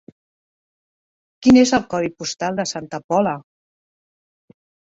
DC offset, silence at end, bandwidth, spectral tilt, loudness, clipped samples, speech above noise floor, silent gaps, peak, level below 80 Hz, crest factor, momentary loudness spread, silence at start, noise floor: under 0.1%; 1.5 s; 7.8 kHz; -4.5 dB/octave; -18 LUFS; under 0.1%; over 72 dB; 3.04-3.09 s; -2 dBFS; -54 dBFS; 20 dB; 12 LU; 1.4 s; under -90 dBFS